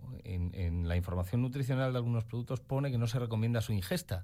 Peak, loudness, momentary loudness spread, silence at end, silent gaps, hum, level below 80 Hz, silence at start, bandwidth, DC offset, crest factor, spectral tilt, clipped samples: -20 dBFS; -34 LUFS; 6 LU; 0 s; none; none; -50 dBFS; 0 s; 16 kHz; under 0.1%; 12 dB; -7 dB/octave; under 0.1%